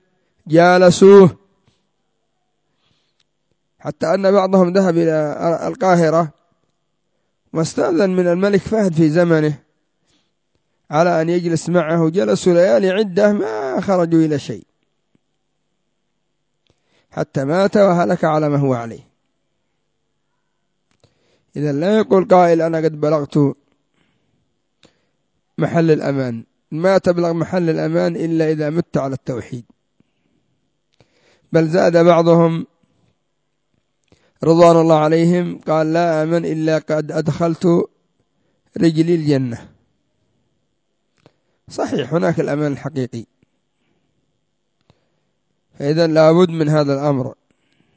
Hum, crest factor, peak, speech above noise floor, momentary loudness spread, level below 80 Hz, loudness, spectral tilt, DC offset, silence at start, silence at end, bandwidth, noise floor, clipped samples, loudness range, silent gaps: none; 18 dB; 0 dBFS; 58 dB; 14 LU; -56 dBFS; -15 LUFS; -7 dB/octave; under 0.1%; 0.45 s; 0.65 s; 8 kHz; -72 dBFS; under 0.1%; 8 LU; none